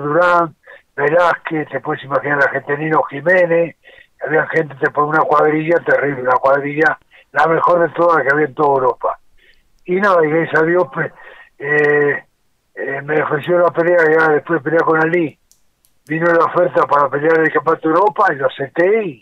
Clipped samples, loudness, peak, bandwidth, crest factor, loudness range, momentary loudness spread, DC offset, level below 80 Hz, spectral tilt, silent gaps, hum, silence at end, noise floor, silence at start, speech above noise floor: under 0.1%; -15 LUFS; -4 dBFS; 7.6 kHz; 12 dB; 2 LU; 10 LU; under 0.1%; -60 dBFS; -7.5 dB/octave; none; none; 0.05 s; -59 dBFS; 0 s; 44 dB